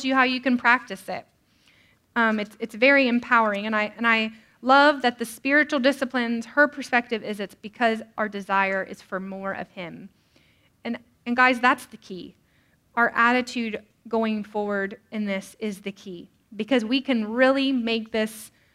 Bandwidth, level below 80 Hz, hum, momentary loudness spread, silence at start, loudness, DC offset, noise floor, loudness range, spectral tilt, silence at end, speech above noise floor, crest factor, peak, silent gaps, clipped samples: 15 kHz; -68 dBFS; none; 17 LU; 0 s; -23 LUFS; under 0.1%; -63 dBFS; 7 LU; -4.5 dB/octave; 0.25 s; 40 dB; 20 dB; -4 dBFS; none; under 0.1%